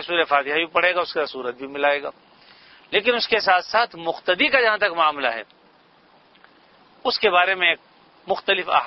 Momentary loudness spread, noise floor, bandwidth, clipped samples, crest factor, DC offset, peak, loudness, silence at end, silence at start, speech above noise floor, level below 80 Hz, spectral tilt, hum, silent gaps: 10 LU; -55 dBFS; 6 kHz; under 0.1%; 22 dB; under 0.1%; 0 dBFS; -20 LUFS; 0 s; 0 s; 34 dB; -64 dBFS; -4 dB/octave; none; none